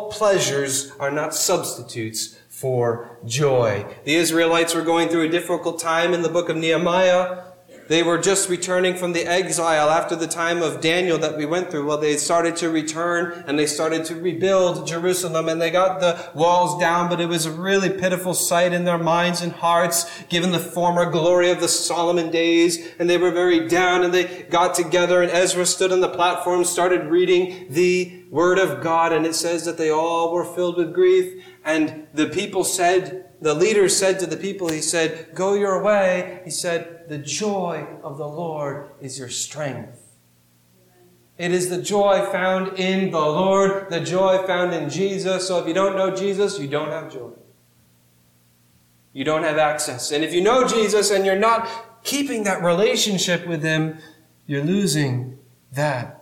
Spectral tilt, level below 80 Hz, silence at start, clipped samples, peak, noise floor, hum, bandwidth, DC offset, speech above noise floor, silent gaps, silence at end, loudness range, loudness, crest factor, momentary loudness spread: -4 dB/octave; -62 dBFS; 0 s; under 0.1%; -6 dBFS; -58 dBFS; 60 Hz at -55 dBFS; 17.5 kHz; under 0.1%; 38 dB; none; 0.05 s; 6 LU; -20 LUFS; 14 dB; 9 LU